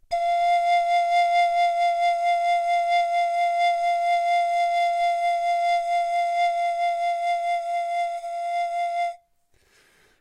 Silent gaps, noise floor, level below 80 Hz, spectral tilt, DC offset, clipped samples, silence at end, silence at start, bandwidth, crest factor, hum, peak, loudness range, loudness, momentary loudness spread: none; -63 dBFS; -62 dBFS; 1.5 dB/octave; under 0.1%; under 0.1%; 1.05 s; 0.1 s; 10.5 kHz; 10 dB; none; -12 dBFS; 5 LU; -23 LUFS; 6 LU